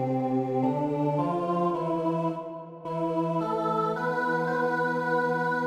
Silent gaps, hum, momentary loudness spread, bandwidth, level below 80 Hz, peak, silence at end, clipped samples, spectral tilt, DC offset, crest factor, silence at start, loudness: none; none; 5 LU; 13.5 kHz; -72 dBFS; -14 dBFS; 0 s; under 0.1%; -8 dB/octave; under 0.1%; 14 dB; 0 s; -28 LUFS